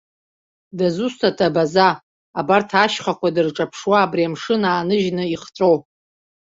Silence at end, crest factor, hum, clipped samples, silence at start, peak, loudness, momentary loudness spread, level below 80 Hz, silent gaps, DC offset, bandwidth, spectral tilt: 0.7 s; 18 dB; none; under 0.1%; 0.75 s; 0 dBFS; -19 LUFS; 8 LU; -60 dBFS; 2.03-2.34 s; under 0.1%; 7.8 kHz; -5.5 dB/octave